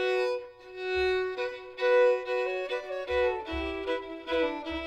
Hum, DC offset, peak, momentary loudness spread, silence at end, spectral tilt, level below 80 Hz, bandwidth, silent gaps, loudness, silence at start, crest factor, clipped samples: none; under 0.1%; -16 dBFS; 11 LU; 0 s; -5 dB/octave; -50 dBFS; 8.6 kHz; none; -30 LUFS; 0 s; 14 dB; under 0.1%